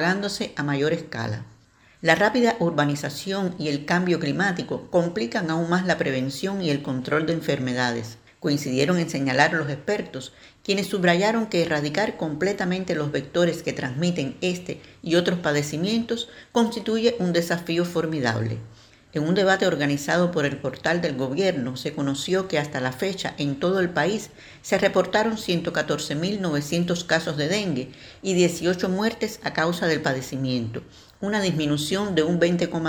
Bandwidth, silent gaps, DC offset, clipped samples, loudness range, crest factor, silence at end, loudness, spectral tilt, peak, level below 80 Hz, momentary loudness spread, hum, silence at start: over 20 kHz; none; under 0.1%; under 0.1%; 2 LU; 22 dB; 0 s; -24 LUFS; -5 dB/octave; -2 dBFS; -58 dBFS; 8 LU; none; 0 s